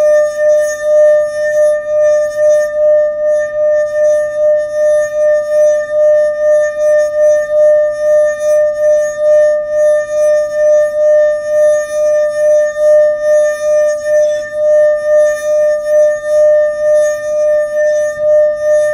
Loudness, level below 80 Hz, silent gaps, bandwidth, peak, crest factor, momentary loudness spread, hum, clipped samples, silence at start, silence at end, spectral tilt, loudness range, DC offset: -11 LUFS; -50 dBFS; none; 11 kHz; -2 dBFS; 8 dB; 3 LU; none; under 0.1%; 0 s; 0 s; -2.5 dB/octave; 1 LU; under 0.1%